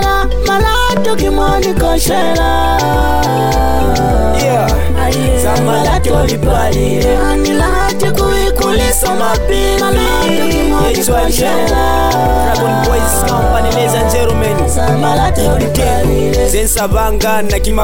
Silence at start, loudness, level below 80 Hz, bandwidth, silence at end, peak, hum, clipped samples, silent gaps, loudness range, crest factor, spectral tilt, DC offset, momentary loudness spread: 0 s; -12 LUFS; -16 dBFS; 17 kHz; 0 s; -2 dBFS; none; under 0.1%; none; 0 LU; 10 dB; -4.5 dB/octave; 9%; 2 LU